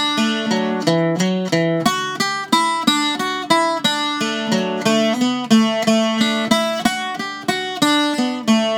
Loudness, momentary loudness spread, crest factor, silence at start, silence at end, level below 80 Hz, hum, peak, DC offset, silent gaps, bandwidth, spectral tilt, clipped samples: -18 LUFS; 5 LU; 16 dB; 0 s; 0 s; -60 dBFS; none; 0 dBFS; under 0.1%; none; 19 kHz; -4 dB/octave; under 0.1%